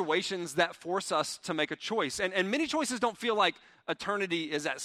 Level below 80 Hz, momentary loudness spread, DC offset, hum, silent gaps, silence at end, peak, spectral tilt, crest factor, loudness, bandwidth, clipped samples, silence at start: -70 dBFS; 5 LU; under 0.1%; none; none; 0 s; -10 dBFS; -3 dB/octave; 20 dB; -31 LUFS; 15.5 kHz; under 0.1%; 0 s